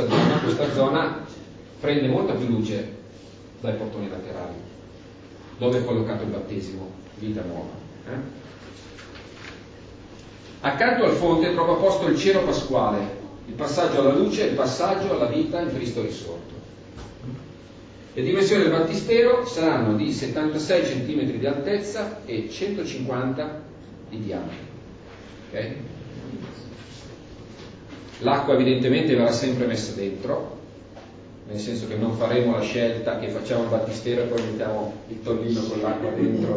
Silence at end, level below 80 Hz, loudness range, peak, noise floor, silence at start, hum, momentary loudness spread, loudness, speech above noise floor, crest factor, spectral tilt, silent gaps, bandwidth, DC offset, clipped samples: 0 s; -52 dBFS; 13 LU; -6 dBFS; -44 dBFS; 0 s; none; 23 LU; -24 LUFS; 21 dB; 20 dB; -6 dB/octave; none; 8 kHz; under 0.1%; under 0.1%